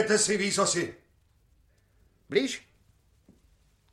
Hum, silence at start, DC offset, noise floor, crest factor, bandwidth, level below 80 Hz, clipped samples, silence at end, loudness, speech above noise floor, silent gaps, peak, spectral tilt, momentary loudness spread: none; 0 s; under 0.1%; -65 dBFS; 20 dB; 13.5 kHz; -66 dBFS; under 0.1%; 1.35 s; -27 LUFS; 38 dB; none; -12 dBFS; -2.5 dB/octave; 12 LU